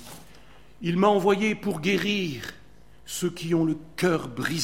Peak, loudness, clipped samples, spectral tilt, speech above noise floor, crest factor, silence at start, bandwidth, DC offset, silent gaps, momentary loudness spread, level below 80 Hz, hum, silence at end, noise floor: -6 dBFS; -25 LUFS; under 0.1%; -5 dB/octave; 28 dB; 20 dB; 0 s; 16.5 kHz; 0.4%; none; 13 LU; -56 dBFS; none; 0 s; -52 dBFS